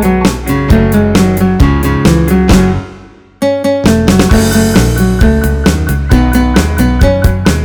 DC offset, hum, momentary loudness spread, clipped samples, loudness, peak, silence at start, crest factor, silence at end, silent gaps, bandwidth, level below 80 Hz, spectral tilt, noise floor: under 0.1%; none; 5 LU; 1%; -10 LUFS; 0 dBFS; 0 s; 8 dB; 0 s; none; over 20 kHz; -14 dBFS; -6 dB/octave; -34 dBFS